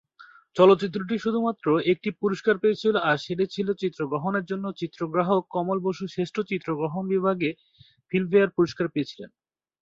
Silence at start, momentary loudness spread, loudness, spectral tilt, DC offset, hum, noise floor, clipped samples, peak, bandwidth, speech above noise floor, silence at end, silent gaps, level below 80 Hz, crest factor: 0.2 s; 9 LU; -25 LUFS; -7 dB/octave; under 0.1%; none; -53 dBFS; under 0.1%; -4 dBFS; 7.6 kHz; 28 dB; 0.55 s; none; -66 dBFS; 20 dB